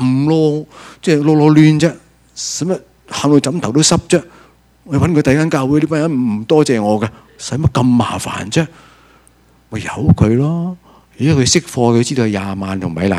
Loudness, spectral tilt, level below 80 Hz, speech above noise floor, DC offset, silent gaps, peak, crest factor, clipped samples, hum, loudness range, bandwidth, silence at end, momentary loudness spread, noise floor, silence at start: -14 LUFS; -5.5 dB/octave; -40 dBFS; 36 dB; under 0.1%; none; 0 dBFS; 14 dB; under 0.1%; none; 4 LU; 13 kHz; 0 s; 12 LU; -50 dBFS; 0 s